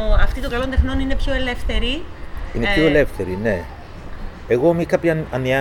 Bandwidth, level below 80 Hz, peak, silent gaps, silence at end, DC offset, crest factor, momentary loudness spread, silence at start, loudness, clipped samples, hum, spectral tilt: 13 kHz; -22 dBFS; -4 dBFS; none; 0 s; under 0.1%; 16 dB; 19 LU; 0 s; -20 LUFS; under 0.1%; none; -6.5 dB/octave